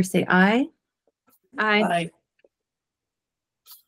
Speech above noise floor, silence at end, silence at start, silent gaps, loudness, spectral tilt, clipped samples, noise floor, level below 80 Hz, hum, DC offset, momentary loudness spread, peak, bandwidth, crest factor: 66 dB; 0.15 s; 0 s; none; -21 LUFS; -5.5 dB/octave; under 0.1%; -87 dBFS; -70 dBFS; none; under 0.1%; 15 LU; -4 dBFS; 16 kHz; 20 dB